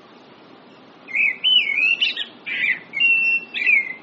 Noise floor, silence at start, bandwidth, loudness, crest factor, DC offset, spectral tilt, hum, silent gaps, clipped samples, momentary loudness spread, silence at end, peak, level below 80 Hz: -46 dBFS; 1.05 s; 8 kHz; -17 LUFS; 14 dB; under 0.1%; 4 dB/octave; none; none; under 0.1%; 8 LU; 0 s; -6 dBFS; -80 dBFS